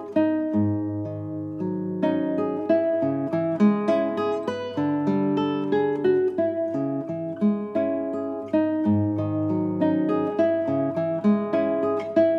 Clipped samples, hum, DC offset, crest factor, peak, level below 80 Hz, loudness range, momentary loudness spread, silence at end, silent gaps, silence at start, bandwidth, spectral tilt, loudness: under 0.1%; none; under 0.1%; 16 dB; -8 dBFS; -68 dBFS; 2 LU; 7 LU; 0 s; none; 0 s; 6.4 kHz; -9 dB/octave; -24 LUFS